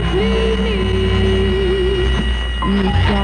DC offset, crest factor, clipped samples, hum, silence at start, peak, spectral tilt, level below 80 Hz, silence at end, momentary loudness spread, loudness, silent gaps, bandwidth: under 0.1%; 10 dB; under 0.1%; none; 0 s; -4 dBFS; -6.5 dB/octave; -20 dBFS; 0 s; 3 LU; -17 LUFS; none; 9.2 kHz